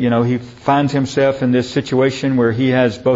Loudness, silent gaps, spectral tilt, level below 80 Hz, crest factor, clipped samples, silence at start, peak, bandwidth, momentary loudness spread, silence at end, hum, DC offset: -16 LUFS; none; -7 dB/octave; -50 dBFS; 14 dB; under 0.1%; 0 s; 0 dBFS; 8 kHz; 3 LU; 0 s; none; under 0.1%